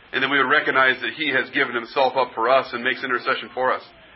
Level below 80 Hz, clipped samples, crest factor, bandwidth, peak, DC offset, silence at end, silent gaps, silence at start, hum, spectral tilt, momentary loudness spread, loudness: -66 dBFS; under 0.1%; 18 dB; 5.8 kHz; -2 dBFS; under 0.1%; 0.3 s; none; 0.15 s; none; -8 dB/octave; 6 LU; -20 LUFS